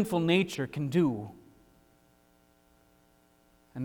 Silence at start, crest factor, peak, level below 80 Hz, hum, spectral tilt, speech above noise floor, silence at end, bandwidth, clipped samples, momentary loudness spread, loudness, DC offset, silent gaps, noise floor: 0 s; 20 dB; -14 dBFS; -66 dBFS; none; -6.5 dB/octave; 37 dB; 0 s; 19.5 kHz; under 0.1%; 18 LU; -29 LUFS; under 0.1%; none; -65 dBFS